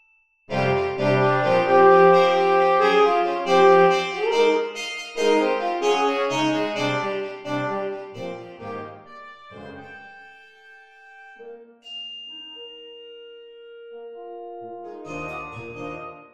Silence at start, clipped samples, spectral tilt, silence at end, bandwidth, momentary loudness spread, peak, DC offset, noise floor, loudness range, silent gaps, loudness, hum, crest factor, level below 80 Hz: 0.5 s; under 0.1%; -5 dB/octave; 0.15 s; 9.6 kHz; 25 LU; -4 dBFS; under 0.1%; -55 dBFS; 22 LU; none; -20 LUFS; none; 18 dB; -62 dBFS